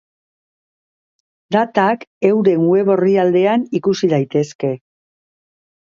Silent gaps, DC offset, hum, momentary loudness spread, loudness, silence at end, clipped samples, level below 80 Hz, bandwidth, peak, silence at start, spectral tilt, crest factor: 2.07-2.21 s, 4.55-4.59 s; under 0.1%; none; 7 LU; -16 LUFS; 1.15 s; under 0.1%; -66 dBFS; 7.4 kHz; 0 dBFS; 1.5 s; -7 dB/octave; 16 dB